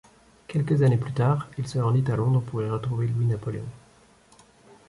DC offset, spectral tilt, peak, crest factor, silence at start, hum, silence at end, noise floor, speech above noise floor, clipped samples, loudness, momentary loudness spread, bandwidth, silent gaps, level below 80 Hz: under 0.1%; -8.5 dB/octave; -10 dBFS; 14 dB; 0.5 s; none; 1.1 s; -56 dBFS; 33 dB; under 0.1%; -25 LUFS; 9 LU; 11.5 kHz; none; -54 dBFS